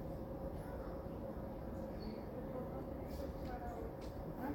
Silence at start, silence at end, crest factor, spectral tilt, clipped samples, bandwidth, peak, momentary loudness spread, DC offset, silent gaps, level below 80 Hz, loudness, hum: 0 s; 0 s; 14 dB; -8 dB/octave; under 0.1%; 17 kHz; -32 dBFS; 1 LU; under 0.1%; none; -52 dBFS; -47 LUFS; none